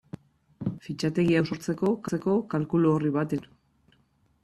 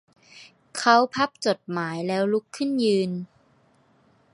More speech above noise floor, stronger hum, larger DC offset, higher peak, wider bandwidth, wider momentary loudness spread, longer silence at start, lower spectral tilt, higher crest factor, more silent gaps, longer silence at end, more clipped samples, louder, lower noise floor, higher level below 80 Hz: about the same, 41 dB vs 38 dB; neither; neither; second, -12 dBFS vs -2 dBFS; first, 13 kHz vs 11.5 kHz; about the same, 11 LU vs 12 LU; first, 0.6 s vs 0.35 s; first, -7.5 dB/octave vs -5 dB/octave; second, 16 dB vs 22 dB; neither; about the same, 1 s vs 1.1 s; neither; second, -27 LUFS vs -24 LUFS; first, -66 dBFS vs -61 dBFS; first, -62 dBFS vs -70 dBFS